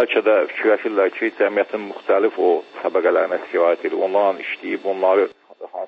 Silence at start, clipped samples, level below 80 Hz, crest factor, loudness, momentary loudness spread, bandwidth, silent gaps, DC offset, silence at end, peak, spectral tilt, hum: 0 s; under 0.1%; -78 dBFS; 14 dB; -19 LUFS; 8 LU; 5.6 kHz; none; under 0.1%; 0 s; -6 dBFS; -6 dB/octave; none